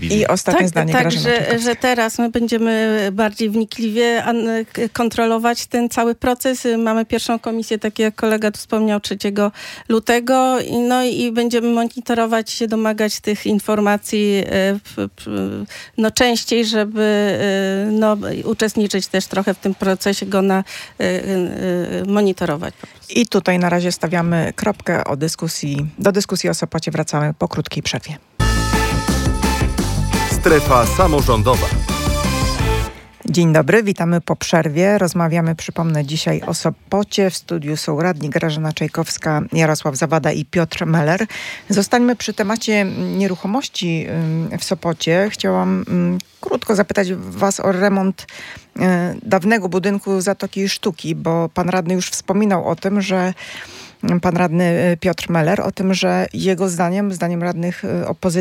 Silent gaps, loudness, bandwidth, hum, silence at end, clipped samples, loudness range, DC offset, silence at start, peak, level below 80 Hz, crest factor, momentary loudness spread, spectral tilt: none; -18 LUFS; 17 kHz; none; 0 s; under 0.1%; 3 LU; under 0.1%; 0 s; 0 dBFS; -32 dBFS; 16 dB; 6 LU; -5 dB/octave